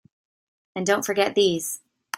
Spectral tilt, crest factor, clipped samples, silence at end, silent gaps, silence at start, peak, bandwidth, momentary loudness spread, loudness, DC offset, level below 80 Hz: -3 dB/octave; 18 dB; under 0.1%; 0.4 s; none; 0.75 s; -8 dBFS; 16 kHz; 14 LU; -23 LUFS; under 0.1%; -68 dBFS